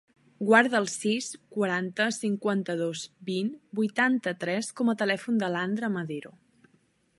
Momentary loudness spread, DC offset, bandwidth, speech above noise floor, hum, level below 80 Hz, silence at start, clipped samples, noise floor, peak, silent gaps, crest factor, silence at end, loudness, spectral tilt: 11 LU; under 0.1%; 11.5 kHz; 40 dB; none; -78 dBFS; 0.4 s; under 0.1%; -67 dBFS; -6 dBFS; none; 22 dB; 0.9 s; -28 LUFS; -4.5 dB/octave